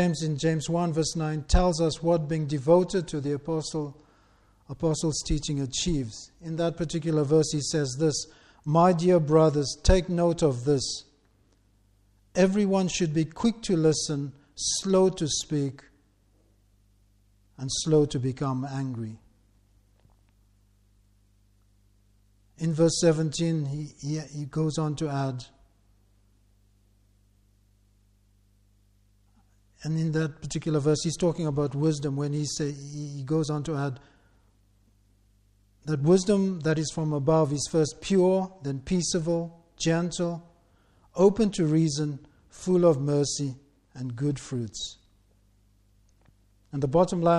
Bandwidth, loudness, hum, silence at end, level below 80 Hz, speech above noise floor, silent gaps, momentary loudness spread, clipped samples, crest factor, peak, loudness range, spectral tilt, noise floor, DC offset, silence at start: 11.5 kHz; -26 LUFS; 50 Hz at -55 dBFS; 0 s; -42 dBFS; 38 dB; none; 12 LU; under 0.1%; 20 dB; -8 dBFS; 10 LU; -5.5 dB/octave; -64 dBFS; under 0.1%; 0 s